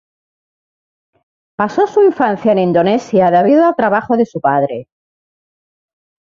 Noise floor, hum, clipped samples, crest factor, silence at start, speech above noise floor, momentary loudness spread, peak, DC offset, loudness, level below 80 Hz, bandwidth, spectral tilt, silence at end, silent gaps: under -90 dBFS; none; under 0.1%; 14 dB; 1.6 s; over 78 dB; 8 LU; -2 dBFS; under 0.1%; -13 LUFS; -58 dBFS; 7.4 kHz; -7.5 dB/octave; 1.5 s; none